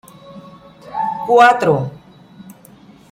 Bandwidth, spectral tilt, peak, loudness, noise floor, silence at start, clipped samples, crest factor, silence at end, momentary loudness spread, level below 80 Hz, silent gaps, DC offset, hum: 16 kHz; -5.5 dB/octave; 0 dBFS; -14 LUFS; -44 dBFS; 0.3 s; under 0.1%; 18 dB; 0.6 s; 17 LU; -58 dBFS; none; under 0.1%; none